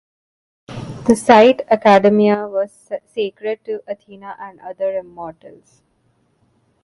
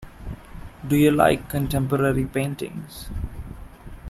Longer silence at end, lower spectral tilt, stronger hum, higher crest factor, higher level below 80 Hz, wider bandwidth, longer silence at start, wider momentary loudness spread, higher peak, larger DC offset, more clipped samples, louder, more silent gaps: first, 1.35 s vs 0 s; about the same, -5.5 dB/octave vs -6.5 dB/octave; neither; about the same, 18 dB vs 22 dB; second, -56 dBFS vs -38 dBFS; second, 11.5 kHz vs 16 kHz; first, 0.7 s vs 0 s; about the same, 22 LU vs 22 LU; about the same, 0 dBFS vs -2 dBFS; neither; neither; first, -16 LUFS vs -22 LUFS; neither